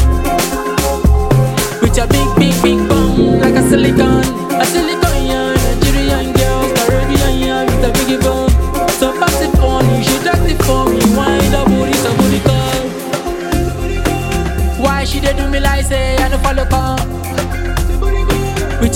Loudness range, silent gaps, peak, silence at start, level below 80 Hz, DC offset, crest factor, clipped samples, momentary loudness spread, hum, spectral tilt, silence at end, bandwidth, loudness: 4 LU; none; 0 dBFS; 0 s; -18 dBFS; under 0.1%; 12 dB; under 0.1%; 6 LU; none; -5 dB/octave; 0 s; 17 kHz; -13 LUFS